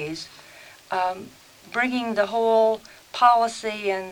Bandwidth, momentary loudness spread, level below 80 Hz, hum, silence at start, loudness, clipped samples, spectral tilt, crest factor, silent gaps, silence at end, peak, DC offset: 19 kHz; 17 LU; -64 dBFS; none; 0 s; -23 LUFS; under 0.1%; -3.5 dB/octave; 20 dB; none; 0 s; -4 dBFS; under 0.1%